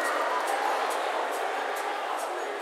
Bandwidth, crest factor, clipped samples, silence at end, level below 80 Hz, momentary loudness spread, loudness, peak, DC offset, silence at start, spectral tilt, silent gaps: 16 kHz; 14 dB; under 0.1%; 0 s; under -90 dBFS; 4 LU; -29 LUFS; -14 dBFS; under 0.1%; 0 s; 1 dB/octave; none